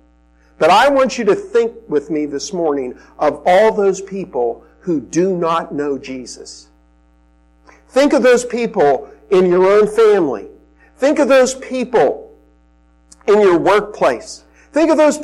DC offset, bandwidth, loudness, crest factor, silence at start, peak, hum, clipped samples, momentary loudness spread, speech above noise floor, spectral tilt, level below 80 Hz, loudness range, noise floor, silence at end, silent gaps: under 0.1%; 13 kHz; -15 LUFS; 12 dB; 0.6 s; -4 dBFS; none; under 0.1%; 13 LU; 38 dB; -5 dB/octave; -50 dBFS; 6 LU; -52 dBFS; 0 s; none